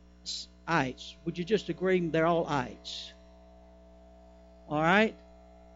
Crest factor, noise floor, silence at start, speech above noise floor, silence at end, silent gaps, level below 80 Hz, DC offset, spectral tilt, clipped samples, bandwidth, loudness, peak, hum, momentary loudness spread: 22 dB; -54 dBFS; 0.25 s; 25 dB; 0.6 s; none; -56 dBFS; under 0.1%; -5.5 dB/octave; under 0.1%; 8 kHz; -30 LUFS; -10 dBFS; 60 Hz at -50 dBFS; 14 LU